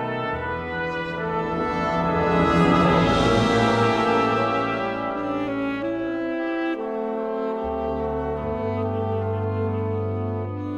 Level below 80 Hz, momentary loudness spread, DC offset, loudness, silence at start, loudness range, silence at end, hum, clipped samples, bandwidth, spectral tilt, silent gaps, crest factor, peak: -42 dBFS; 9 LU; under 0.1%; -23 LUFS; 0 s; 7 LU; 0 s; none; under 0.1%; 10.5 kHz; -7 dB/octave; none; 18 dB; -6 dBFS